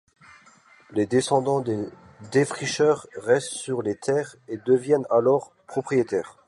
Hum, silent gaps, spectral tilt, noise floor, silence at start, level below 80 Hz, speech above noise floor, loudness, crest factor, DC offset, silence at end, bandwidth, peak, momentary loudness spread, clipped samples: none; none; -5 dB/octave; -54 dBFS; 0.9 s; -66 dBFS; 31 dB; -24 LUFS; 18 dB; under 0.1%; 0.15 s; 11.5 kHz; -8 dBFS; 10 LU; under 0.1%